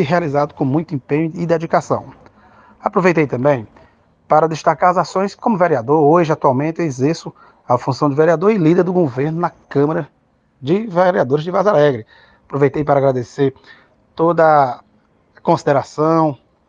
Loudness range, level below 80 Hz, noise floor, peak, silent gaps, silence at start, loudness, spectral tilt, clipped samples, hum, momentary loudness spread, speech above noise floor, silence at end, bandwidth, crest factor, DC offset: 3 LU; -56 dBFS; -56 dBFS; 0 dBFS; none; 0 s; -16 LUFS; -7.5 dB/octave; under 0.1%; none; 9 LU; 41 dB; 0.35 s; 7.8 kHz; 16 dB; under 0.1%